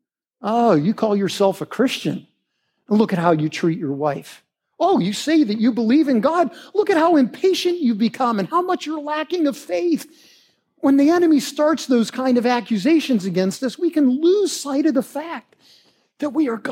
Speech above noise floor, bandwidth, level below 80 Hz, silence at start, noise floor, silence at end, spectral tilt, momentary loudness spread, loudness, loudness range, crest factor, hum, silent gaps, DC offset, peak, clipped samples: 54 dB; 16 kHz; -74 dBFS; 0.4 s; -72 dBFS; 0 s; -5.5 dB/octave; 8 LU; -19 LUFS; 3 LU; 18 dB; none; none; under 0.1%; -2 dBFS; under 0.1%